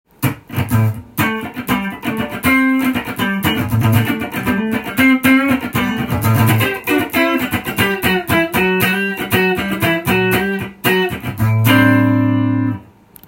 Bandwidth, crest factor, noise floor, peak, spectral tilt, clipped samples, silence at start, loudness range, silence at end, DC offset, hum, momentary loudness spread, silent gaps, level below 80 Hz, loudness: 17 kHz; 16 dB; -41 dBFS; 0 dBFS; -5.5 dB/octave; under 0.1%; 0.2 s; 2 LU; 0.45 s; under 0.1%; none; 8 LU; none; -44 dBFS; -15 LUFS